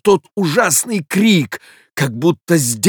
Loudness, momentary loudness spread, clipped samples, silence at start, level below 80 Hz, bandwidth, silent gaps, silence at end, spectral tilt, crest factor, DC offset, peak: -15 LUFS; 11 LU; under 0.1%; 0.05 s; -60 dBFS; over 20 kHz; none; 0 s; -4 dB/octave; 14 dB; under 0.1%; -2 dBFS